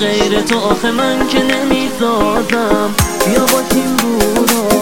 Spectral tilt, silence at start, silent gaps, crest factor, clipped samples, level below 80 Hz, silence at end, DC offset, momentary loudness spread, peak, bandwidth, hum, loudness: -3.5 dB/octave; 0 s; none; 12 dB; under 0.1%; -30 dBFS; 0 s; 2%; 2 LU; 0 dBFS; 17 kHz; none; -13 LUFS